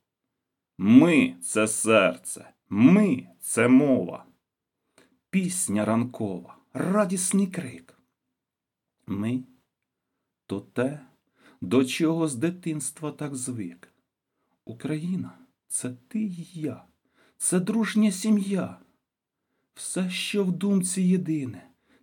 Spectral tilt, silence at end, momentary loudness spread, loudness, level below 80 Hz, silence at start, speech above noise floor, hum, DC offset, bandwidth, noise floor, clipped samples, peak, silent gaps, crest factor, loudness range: -5 dB/octave; 0.45 s; 17 LU; -25 LUFS; -76 dBFS; 0.8 s; 63 dB; none; under 0.1%; 19 kHz; -87 dBFS; under 0.1%; -4 dBFS; none; 22 dB; 12 LU